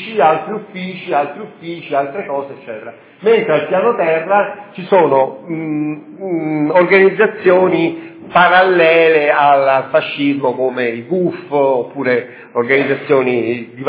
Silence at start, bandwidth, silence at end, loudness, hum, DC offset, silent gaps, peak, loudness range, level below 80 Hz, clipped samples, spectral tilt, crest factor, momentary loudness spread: 0 s; 4 kHz; 0 s; -14 LUFS; none; under 0.1%; none; 0 dBFS; 6 LU; -66 dBFS; under 0.1%; -9.5 dB/octave; 14 dB; 14 LU